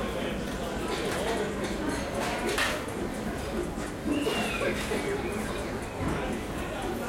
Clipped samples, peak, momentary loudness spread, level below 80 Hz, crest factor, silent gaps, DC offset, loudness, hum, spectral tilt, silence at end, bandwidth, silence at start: under 0.1%; -14 dBFS; 6 LU; -42 dBFS; 16 dB; none; under 0.1%; -31 LUFS; none; -4.5 dB/octave; 0 s; 16.5 kHz; 0 s